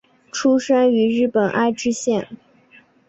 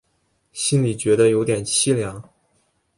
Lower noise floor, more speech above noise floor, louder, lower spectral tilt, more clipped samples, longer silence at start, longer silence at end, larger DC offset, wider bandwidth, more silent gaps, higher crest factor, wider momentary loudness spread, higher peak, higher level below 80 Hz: second, -52 dBFS vs -67 dBFS; second, 34 dB vs 48 dB; about the same, -18 LUFS vs -19 LUFS; about the same, -4.5 dB/octave vs -4.5 dB/octave; neither; second, 0.35 s vs 0.55 s; about the same, 0.75 s vs 0.75 s; neither; second, 8.2 kHz vs 11.5 kHz; neither; about the same, 14 dB vs 18 dB; second, 8 LU vs 15 LU; about the same, -6 dBFS vs -4 dBFS; second, -60 dBFS vs -54 dBFS